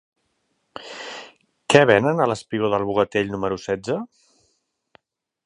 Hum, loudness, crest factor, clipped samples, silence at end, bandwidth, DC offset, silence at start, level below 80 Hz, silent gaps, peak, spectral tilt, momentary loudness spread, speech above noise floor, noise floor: none; -20 LUFS; 24 dB; under 0.1%; 1.4 s; 11 kHz; under 0.1%; 0.8 s; -56 dBFS; none; 0 dBFS; -5 dB/octave; 23 LU; 51 dB; -71 dBFS